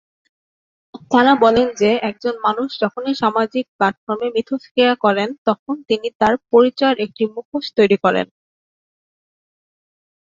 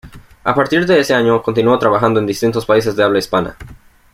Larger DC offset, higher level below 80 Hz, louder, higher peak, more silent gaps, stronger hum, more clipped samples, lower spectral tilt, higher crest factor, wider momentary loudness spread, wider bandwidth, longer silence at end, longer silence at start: neither; second, -56 dBFS vs -44 dBFS; second, -17 LUFS vs -14 LUFS; about the same, -2 dBFS vs -2 dBFS; first, 3.68-3.79 s, 3.98-4.07 s, 4.71-4.75 s, 5.38-5.46 s, 5.59-5.66 s, 6.15-6.20 s, 7.45-7.52 s vs none; neither; neither; about the same, -5.5 dB/octave vs -5.5 dB/octave; about the same, 16 dB vs 14 dB; first, 9 LU vs 6 LU; second, 7.6 kHz vs 16 kHz; first, 2.05 s vs 0.4 s; first, 0.95 s vs 0.05 s